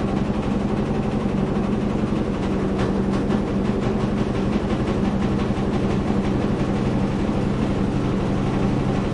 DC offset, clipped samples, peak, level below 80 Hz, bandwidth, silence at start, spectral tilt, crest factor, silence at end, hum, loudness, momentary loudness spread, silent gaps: under 0.1%; under 0.1%; -8 dBFS; -32 dBFS; 10.5 kHz; 0 s; -8 dB/octave; 14 dB; 0 s; none; -22 LUFS; 1 LU; none